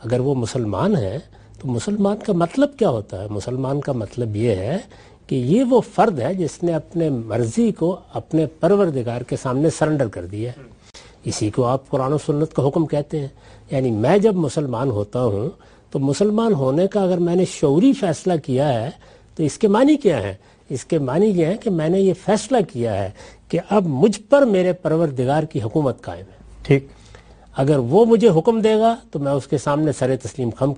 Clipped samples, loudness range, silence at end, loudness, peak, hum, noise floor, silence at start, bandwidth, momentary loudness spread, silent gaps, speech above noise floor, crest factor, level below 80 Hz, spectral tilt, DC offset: under 0.1%; 4 LU; 0 s; -19 LUFS; 0 dBFS; none; -44 dBFS; 0 s; 11.5 kHz; 11 LU; none; 26 dB; 18 dB; -50 dBFS; -7 dB/octave; under 0.1%